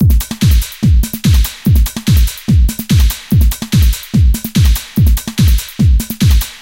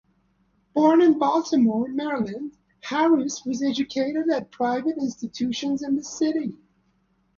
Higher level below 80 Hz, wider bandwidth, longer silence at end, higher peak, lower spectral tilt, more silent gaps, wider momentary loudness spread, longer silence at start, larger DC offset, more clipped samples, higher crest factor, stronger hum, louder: first, -12 dBFS vs -66 dBFS; first, 17.5 kHz vs 7.4 kHz; second, 0.05 s vs 0.85 s; first, -2 dBFS vs -6 dBFS; about the same, -5.5 dB/octave vs -4.5 dB/octave; neither; second, 1 LU vs 11 LU; second, 0 s vs 0.75 s; neither; neither; second, 8 dB vs 18 dB; neither; first, -13 LUFS vs -23 LUFS